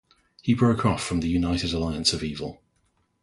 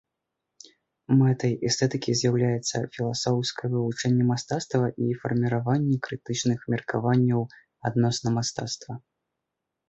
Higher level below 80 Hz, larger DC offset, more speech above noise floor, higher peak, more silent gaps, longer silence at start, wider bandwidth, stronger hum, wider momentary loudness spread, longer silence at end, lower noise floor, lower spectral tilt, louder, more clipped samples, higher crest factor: first, -42 dBFS vs -62 dBFS; neither; second, 45 dB vs 59 dB; first, -6 dBFS vs -10 dBFS; neither; second, 0.45 s vs 1.1 s; first, 11.5 kHz vs 8.2 kHz; neither; first, 11 LU vs 7 LU; second, 0.7 s vs 0.9 s; second, -69 dBFS vs -84 dBFS; about the same, -5 dB/octave vs -5.5 dB/octave; about the same, -25 LUFS vs -26 LUFS; neither; about the same, 20 dB vs 16 dB